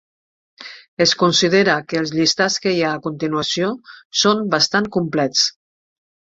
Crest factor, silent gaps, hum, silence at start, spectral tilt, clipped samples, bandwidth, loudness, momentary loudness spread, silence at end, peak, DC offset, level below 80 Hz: 18 dB; 0.88-0.97 s, 4.05-4.10 s; none; 0.6 s; -3.5 dB/octave; under 0.1%; 8 kHz; -17 LUFS; 10 LU; 0.85 s; -2 dBFS; under 0.1%; -60 dBFS